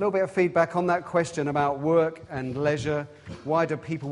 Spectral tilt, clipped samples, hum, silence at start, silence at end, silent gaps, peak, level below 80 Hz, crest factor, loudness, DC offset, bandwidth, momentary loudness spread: -6.5 dB/octave; under 0.1%; none; 0 s; 0 s; none; -8 dBFS; -58 dBFS; 18 dB; -26 LUFS; under 0.1%; 11.5 kHz; 9 LU